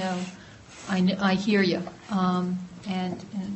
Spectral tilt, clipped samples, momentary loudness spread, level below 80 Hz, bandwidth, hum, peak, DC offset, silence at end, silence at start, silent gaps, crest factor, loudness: -6 dB/octave; under 0.1%; 15 LU; -60 dBFS; 8.4 kHz; none; -12 dBFS; under 0.1%; 0 s; 0 s; none; 14 dB; -27 LUFS